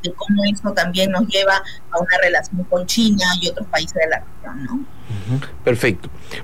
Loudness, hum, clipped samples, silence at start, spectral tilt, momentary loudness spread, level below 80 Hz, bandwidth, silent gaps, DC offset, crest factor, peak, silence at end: -18 LUFS; none; under 0.1%; 0.05 s; -4 dB/octave; 14 LU; -44 dBFS; 16.5 kHz; none; 4%; 12 dB; -6 dBFS; 0 s